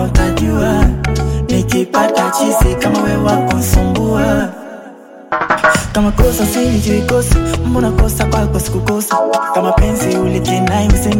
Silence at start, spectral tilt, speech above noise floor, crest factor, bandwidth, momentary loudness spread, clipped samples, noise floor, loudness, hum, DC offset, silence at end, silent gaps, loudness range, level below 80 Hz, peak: 0 s; -5.5 dB/octave; 23 dB; 12 dB; 17 kHz; 4 LU; under 0.1%; -35 dBFS; -14 LUFS; none; under 0.1%; 0 s; none; 1 LU; -18 dBFS; 0 dBFS